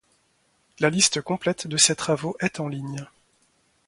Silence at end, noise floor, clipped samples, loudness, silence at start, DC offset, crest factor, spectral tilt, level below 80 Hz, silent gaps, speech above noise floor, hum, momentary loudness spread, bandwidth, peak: 0.8 s; -66 dBFS; under 0.1%; -23 LUFS; 0.8 s; under 0.1%; 24 dB; -2.5 dB/octave; -62 dBFS; none; 42 dB; none; 14 LU; 11.5 kHz; -4 dBFS